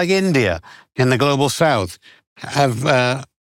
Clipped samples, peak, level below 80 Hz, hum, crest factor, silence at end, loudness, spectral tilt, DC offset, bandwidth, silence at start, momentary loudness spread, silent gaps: under 0.1%; -2 dBFS; -54 dBFS; none; 16 dB; 0.3 s; -17 LUFS; -5 dB/octave; under 0.1%; 17 kHz; 0 s; 13 LU; 2.27-2.36 s